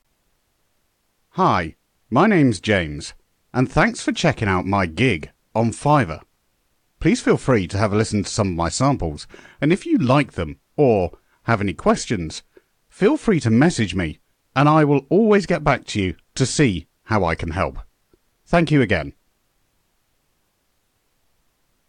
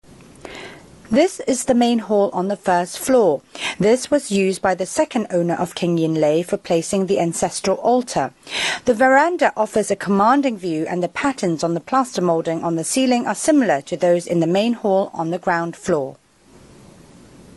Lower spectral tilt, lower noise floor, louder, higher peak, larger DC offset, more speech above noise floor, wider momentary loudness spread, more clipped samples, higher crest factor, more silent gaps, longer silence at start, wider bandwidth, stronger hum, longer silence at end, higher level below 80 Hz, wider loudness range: first, -6 dB/octave vs -4.5 dB/octave; first, -67 dBFS vs -49 dBFS; about the same, -20 LUFS vs -19 LUFS; about the same, -4 dBFS vs -2 dBFS; neither; first, 49 dB vs 30 dB; first, 12 LU vs 7 LU; neither; about the same, 16 dB vs 16 dB; neither; first, 1.35 s vs 0.45 s; second, 10.5 kHz vs 12 kHz; neither; first, 2.8 s vs 1.4 s; first, -42 dBFS vs -56 dBFS; about the same, 4 LU vs 2 LU